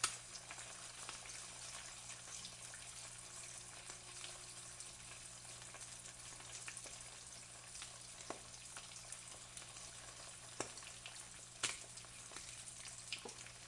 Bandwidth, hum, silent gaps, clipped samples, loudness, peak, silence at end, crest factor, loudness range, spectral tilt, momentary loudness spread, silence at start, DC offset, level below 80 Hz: 12 kHz; 60 Hz at -70 dBFS; none; under 0.1%; -49 LUFS; -20 dBFS; 0 s; 32 dB; 3 LU; -0.5 dB/octave; 4 LU; 0 s; under 0.1%; -72 dBFS